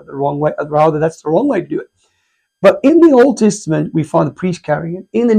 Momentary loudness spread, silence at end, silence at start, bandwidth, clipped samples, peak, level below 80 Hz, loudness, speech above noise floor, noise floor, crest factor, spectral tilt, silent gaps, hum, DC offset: 11 LU; 0 s; 0.1 s; 10 kHz; 0.1%; 0 dBFS; -52 dBFS; -13 LUFS; 52 dB; -65 dBFS; 14 dB; -7 dB/octave; none; none; under 0.1%